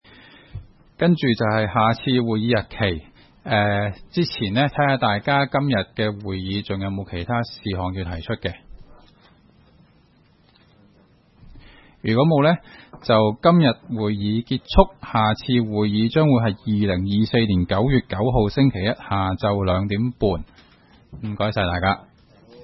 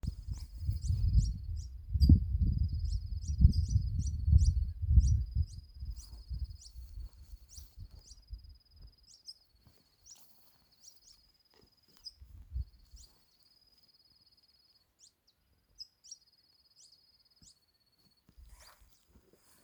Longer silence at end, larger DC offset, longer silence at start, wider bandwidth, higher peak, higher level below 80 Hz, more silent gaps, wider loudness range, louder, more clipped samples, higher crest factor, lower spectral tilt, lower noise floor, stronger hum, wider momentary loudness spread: second, 0 s vs 3.5 s; neither; first, 0.55 s vs 0.05 s; second, 6 kHz vs over 20 kHz; first, 0 dBFS vs -10 dBFS; about the same, -40 dBFS vs -38 dBFS; neither; second, 9 LU vs 25 LU; first, -21 LUFS vs -33 LUFS; neither; about the same, 22 dB vs 26 dB; first, -9.5 dB/octave vs -7 dB/octave; second, -56 dBFS vs -73 dBFS; neither; second, 10 LU vs 25 LU